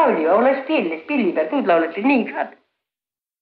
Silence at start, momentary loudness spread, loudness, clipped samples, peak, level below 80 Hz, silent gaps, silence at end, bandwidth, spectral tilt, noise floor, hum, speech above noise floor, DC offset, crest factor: 0 s; 8 LU; -19 LUFS; under 0.1%; -4 dBFS; -70 dBFS; none; 0.9 s; 5.2 kHz; -8.5 dB/octave; under -90 dBFS; none; over 72 dB; under 0.1%; 14 dB